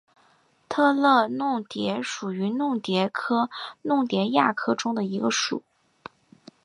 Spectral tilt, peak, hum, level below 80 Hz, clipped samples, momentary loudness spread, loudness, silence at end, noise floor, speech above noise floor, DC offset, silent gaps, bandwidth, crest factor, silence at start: -4.5 dB/octave; -6 dBFS; none; -74 dBFS; under 0.1%; 9 LU; -25 LUFS; 1.05 s; -62 dBFS; 38 dB; under 0.1%; none; 11 kHz; 20 dB; 0.7 s